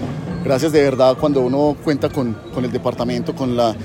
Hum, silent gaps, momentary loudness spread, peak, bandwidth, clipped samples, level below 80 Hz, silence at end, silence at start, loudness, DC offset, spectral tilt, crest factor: none; none; 9 LU; -2 dBFS; 16.5 kHz; under 0.1%; -44 dBFS; 0 s; 0 s; -18 LUFS; under 0.1%; -6.5 dB/octave; 16 dB